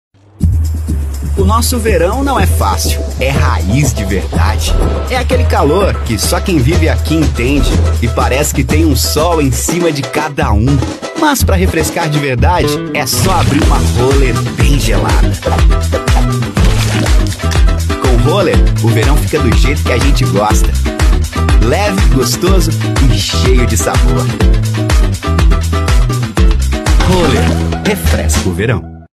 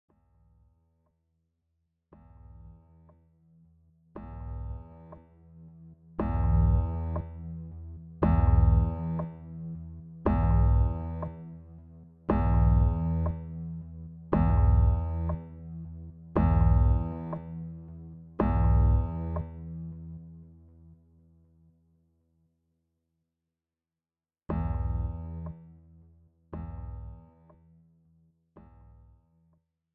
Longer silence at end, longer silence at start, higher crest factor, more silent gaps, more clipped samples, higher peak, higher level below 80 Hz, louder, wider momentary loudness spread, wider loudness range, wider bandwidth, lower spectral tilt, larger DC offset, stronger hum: second, 0.15 s vs 2.75 s; second, 0.4 s vs 2.55 s; second, 10 dB vs 20 dB; neither; neither; first, 0 dBFS vs -10 dBFS; first, -14 dBFS vs -32 dBFS; first, -12 LUFS vs -29 LUFS; second, 4 LU vs 22 LU; second, 1 LU vs 19 LU; first, 14 kHz vs 3 kHz; second, -5 dB/octave vs -13 dB/octave; neither; neither